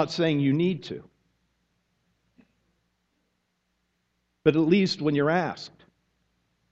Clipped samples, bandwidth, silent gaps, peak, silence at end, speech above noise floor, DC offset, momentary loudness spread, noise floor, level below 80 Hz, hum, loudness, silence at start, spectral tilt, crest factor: under 0.1%; 8 kHz; none; -6 dBFS; 1.05 s; 52 dB; under 0.1%; 18 LU; -75 dBFS; -66 dBFS; none; -24 LUFS; 0 s; -7 dB/octave; 22 dB